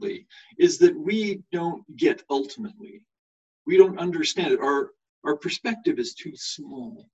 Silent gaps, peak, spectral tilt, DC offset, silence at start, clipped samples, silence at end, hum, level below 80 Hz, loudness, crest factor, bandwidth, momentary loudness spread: 3.19-3.65 s, 5.09-5.22 s; -2 dBFS; -4.5 dB/octave; under 0.1%; 0 s; under 0.1%; 0.15 s; none; -70 dBFS; -24 LUFS; 22 dB; 8.2 kHz; 18 LU